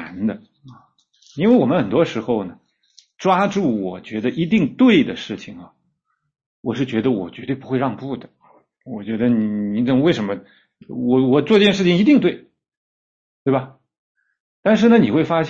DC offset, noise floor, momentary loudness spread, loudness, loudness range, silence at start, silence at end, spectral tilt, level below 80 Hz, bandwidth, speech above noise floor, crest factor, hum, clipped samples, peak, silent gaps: under 0.1%; -71 dBFS; 17 LU; -18 LUFS; 7 LU; 0 s; 0 s; -7 dB/octave; -58 dBFS; 7.4 kHz; 53 dB; 16 dB; none; under 0.1%; -2 dBFS; 6.46-6.63 s, 12.77-13.46 s, 13.98-14.15 s, 14.40-14.63 s